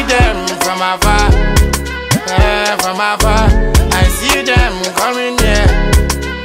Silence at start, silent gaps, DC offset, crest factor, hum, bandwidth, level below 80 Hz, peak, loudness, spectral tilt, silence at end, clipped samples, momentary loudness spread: 0 s; none; under 0.1%; 12 dB; none; 16.5 kHz; -14 dBFS; 0 dBFS; -12 LUFS; -4 dB/octave; 0 s; under 0.1%; 4 LU